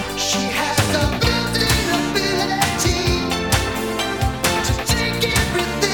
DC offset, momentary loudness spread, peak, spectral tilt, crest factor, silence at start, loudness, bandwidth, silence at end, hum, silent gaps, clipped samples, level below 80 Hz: 0.4%; 3 LU; -2 dBFS; -3.5 dB/octave; 18 dB; 0 s; -19 LUFS; 19 kHz; 0 s; none; none; under 0.1%; -30 dBFS